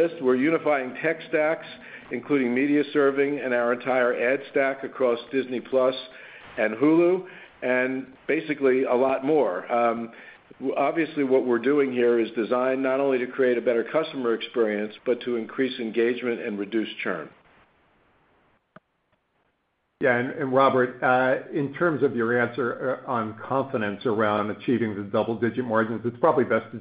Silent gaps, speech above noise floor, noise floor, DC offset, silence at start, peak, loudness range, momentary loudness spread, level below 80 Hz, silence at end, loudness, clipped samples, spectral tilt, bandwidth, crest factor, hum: none; 49 dB; -73 dBFS; under 0.1%; 0 s; -6 dBFS; 6 LU; 8 LU; -72 dBFS; 0 s; -24 LUFS; under 0.1%; -10.5 dB/octave; 5 kHz; 18 dB; none